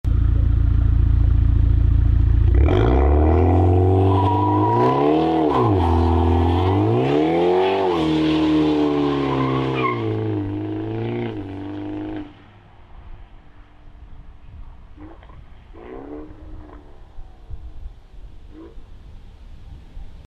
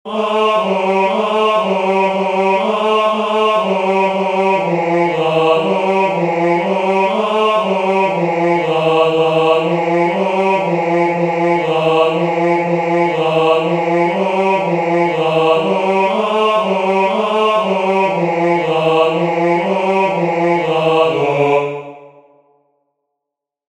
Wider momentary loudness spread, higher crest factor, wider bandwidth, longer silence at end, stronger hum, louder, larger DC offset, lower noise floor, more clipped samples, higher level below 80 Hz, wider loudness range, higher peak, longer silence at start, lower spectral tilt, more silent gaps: first, 17 LU vs 2 LU; about the same, 12 dB vs 14 dB; second, 6.2 kHz vs 10.5 kHz; second, 0.05 s vs 1.6 s; neither; second, -19 LUFS vs -14 LUFS; neither; second, -45 dBFS vs -81 dBFS; neither; first, -24 dBFS vs -60 dBFS; first, 23 LU vs 1 LU; second, -6 dBFS vs 0 dBFS; about the same, 0.05 s vs 0.05 s; first, -9 dB/octave vs -6.5 dB/octave; neither